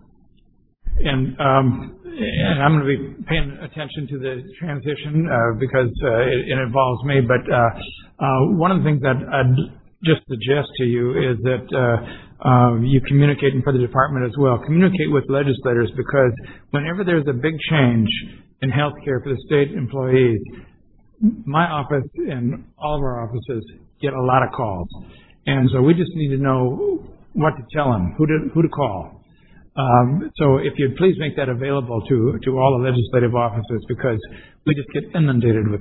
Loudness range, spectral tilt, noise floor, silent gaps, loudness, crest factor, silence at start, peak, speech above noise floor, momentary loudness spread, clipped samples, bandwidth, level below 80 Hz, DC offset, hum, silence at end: 4 LU; -11.5 dB/octave; -56 dBFS; none; -19 LUFS; 18 dB; 0.85 s; -2 dBFS; 38 dB; 11 LU; under 0.1%; 4.1 kHz; -38 dBFS; under 0.1%; none; 0 s